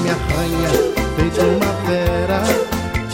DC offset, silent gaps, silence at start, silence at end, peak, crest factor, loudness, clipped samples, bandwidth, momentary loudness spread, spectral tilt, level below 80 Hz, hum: under 0.1%; none; 0 s; 0 s; -2 dBFS; 16 dB; -18 LUFS; under 0.1%; 16.5 kHz; 3 LU; -5.5 dB/octave; -28 dBFS; none